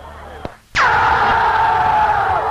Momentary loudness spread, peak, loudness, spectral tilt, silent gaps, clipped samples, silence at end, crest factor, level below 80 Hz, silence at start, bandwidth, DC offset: 19 LU; -4 dBFS; -14 LUFS; -4 dB/octave; none; under 0.1%; 0 s; 10 dB; -36 dBFS; 0 s; 13 kHz; under 0.1%